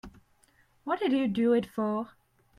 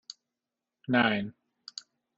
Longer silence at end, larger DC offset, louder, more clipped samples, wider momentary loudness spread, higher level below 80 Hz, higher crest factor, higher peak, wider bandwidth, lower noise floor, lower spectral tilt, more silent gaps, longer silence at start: second, 0.5 s vs 0.85 s; neither; about the same, -29 LUFS vs -27 LUFS; neither; second, 13 LU vs 24 LU; first, -64 dBFS vs -70 dBFS; second, 16 dB vs 24 dB; second, -14 dBFS vs -8 dBFS; first, 12.5 kHz vs 7.8 kHz; second, -65 dBFS vs -89 dBFS; first, -7 dB/octave vs -3 dB/octave; neither; second, 0.05 s vs 0.9 s